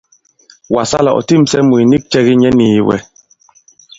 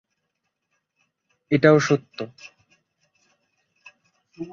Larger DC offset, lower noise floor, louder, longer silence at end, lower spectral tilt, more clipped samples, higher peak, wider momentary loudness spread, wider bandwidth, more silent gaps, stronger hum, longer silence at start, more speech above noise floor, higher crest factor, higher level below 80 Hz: neither; second, -48 dBFS vs -78 dBFS; first, -11 LUFS vs -19 LUFS; first, 0.95 s vs 0 s; about the same, -6 dB/octave vs -6 dB/octave; neither; about the same, 0 dBFS vs -2 dBFS; second, 7 LU vs 20 LU; about the same, 7.8 kHz vs 7.6 kHz; neither; neither; second, 0.7 s vs 1.5 s; second, 38 dB vs 58 dB; second, 12 dB vs 24 dB; first, -44 dBFS vs -64 dBFS